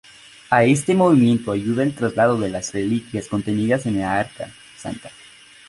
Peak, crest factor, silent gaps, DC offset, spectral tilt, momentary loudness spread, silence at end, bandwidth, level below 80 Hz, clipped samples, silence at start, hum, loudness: -2 dBFS; 18 dB; none; under 0.1%; -6 dB/octave; 17 LU; 0.6 s; 11.5 kHz; -52 dBFS; under 0.1%; 0.5 s; none; -19 LUFS